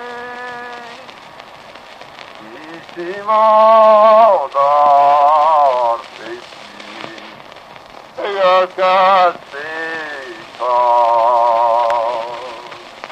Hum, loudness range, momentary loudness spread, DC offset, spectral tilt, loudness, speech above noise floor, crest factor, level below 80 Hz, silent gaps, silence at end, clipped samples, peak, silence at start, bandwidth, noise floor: none; 9 LU; 24 LU; under 0.1%; -4 dB/octave; -12 LUFS; 26 dB; 14 dB; -64 dBFS; none; 0 s; under 0.1%; 0 dBFS; 0 s; 9.2 kHz; -37 dBFS